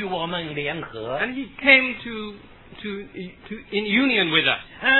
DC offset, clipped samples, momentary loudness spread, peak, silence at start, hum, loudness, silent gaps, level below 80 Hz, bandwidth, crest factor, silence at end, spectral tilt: under 0.1%; under 0.1%; 21 LU; -2 dBFS; 0 s; none; -21 LUFS; none; -54 dBFS; 4.3 kHz; 22 dB; 0 s; -7 dB/octave